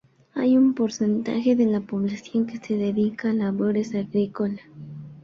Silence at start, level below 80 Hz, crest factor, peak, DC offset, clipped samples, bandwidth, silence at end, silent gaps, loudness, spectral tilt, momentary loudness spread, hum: 0.35 s; -64 dBFS; 14 dB; -10 dBFS; under 0.1%; under 0.1%; 7.2 kHz; 0.05 s; none; -24 LUFS; -7 dB/octave; 11 LU; none